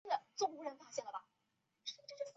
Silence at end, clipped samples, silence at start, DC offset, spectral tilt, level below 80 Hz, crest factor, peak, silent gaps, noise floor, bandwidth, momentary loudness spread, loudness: 0.05 s; under 0.1%; 0.05 s; under 0.1%; 0 dB/octave; under -90 dBFS; 22 dB; -24 dBFS; none; -84 dBFS; 8 kHz; 10 LU; -44 LUFS